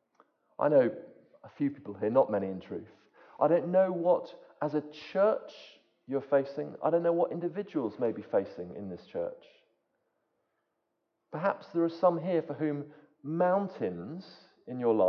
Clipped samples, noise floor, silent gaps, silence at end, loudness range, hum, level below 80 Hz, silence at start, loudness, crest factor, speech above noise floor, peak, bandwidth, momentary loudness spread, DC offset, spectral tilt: under 0.1%; -81 dBFS; none; 0 s; 7 LU; none; -74 dBFS; 0.6 s; -31 LUFS; 20 dB; 51 dB; -12 dBFS; 6.2 kHz; 16 LU; under 0.1%; -9 dB/octave